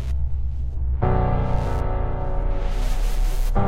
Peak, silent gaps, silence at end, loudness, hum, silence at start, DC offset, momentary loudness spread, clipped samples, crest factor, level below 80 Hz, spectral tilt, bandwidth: -6 dBFS; none; 0 s; -26 LUFS; none; 0 s; under 0.1%; 6 LU; under 0.1%; 14 dB; -22 dBFS; -7.5 dB/octave; 15 kHz